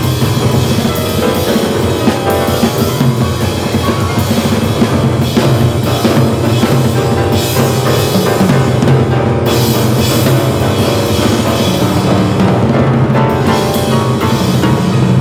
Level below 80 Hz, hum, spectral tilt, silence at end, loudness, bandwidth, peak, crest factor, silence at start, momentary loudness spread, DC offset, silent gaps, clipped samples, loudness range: -32 dBFS; none; -6 dB/octave; 0 s; -11 LUFS; 17 kHz; 0 dBFS; 10 dB; 0 s; 2 LU; under 0.1%; none; under 0.1%; 2 LU